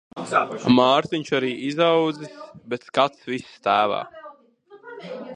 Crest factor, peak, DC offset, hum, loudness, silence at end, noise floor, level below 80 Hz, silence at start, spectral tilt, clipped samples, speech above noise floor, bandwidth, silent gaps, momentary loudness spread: 22 dB; -2 dBFS; under 0.1%; none; -22 LUFS; 0 s; -51 dBFS; -66 dBFS; 0.15 s; -5.5 dB/octave; under 0.1%; 29 dB; 10 kHz; none; 19 LU